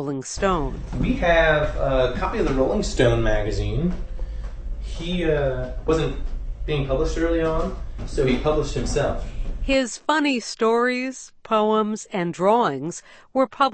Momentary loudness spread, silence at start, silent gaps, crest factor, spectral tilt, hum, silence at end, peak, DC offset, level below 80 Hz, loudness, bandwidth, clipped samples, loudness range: 14 LU; 0 s; none; 16 dB; -5.5 dB/octave; none; 0 s; -6 dBFS; under 0.1%; -30 dBFS; -23 LUFS; 8.8 kHz; under 0.1%; 4 LU